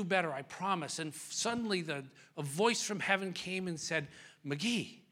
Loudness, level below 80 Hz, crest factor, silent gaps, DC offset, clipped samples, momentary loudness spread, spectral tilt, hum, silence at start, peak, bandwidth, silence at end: -35 LUFS; -78 dBFS; 22 dB; none; under 0.1%; under 0.1%; 10 LU; -3.5 dB/octave; none; 0 s; -14 dBFS; 16.5 kHz; 0.1 s